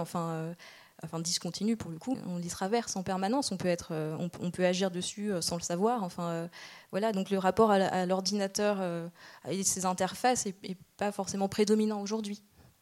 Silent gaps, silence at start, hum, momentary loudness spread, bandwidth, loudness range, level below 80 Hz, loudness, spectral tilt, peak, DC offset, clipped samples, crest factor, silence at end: none; 0 s; none; 13 LU; 16.5 kHz; 4 LU; -66 dBFS; -31 LUFS; -4.5 dB/octave; -10 dBFS; under 0.1%; under 0.1%; 20 dB; 0.45 s